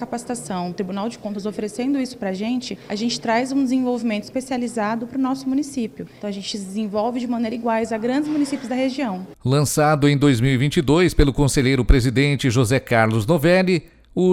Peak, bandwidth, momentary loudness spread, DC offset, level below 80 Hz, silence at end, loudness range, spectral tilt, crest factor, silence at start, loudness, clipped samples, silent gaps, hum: -4 dBFS; 16.5 kHz; 11 LU; under 0.1%; -32 dBFS; 0 s; 7 LU; -6 dB/octave; 16 dB; 0 s; -21 LUFS; under 0.1%; none; none